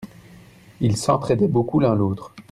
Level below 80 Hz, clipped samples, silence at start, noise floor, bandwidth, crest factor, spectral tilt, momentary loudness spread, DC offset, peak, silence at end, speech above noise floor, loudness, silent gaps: -52 dBFS; under 0.1%; 0 s; -47 dBFS; 13.5 kHz; 16 dB; -7 dB/octave; 9 LU; under 0.1%; -4 dBFS; 0.1 s; 27 dB; -20 LUFS; none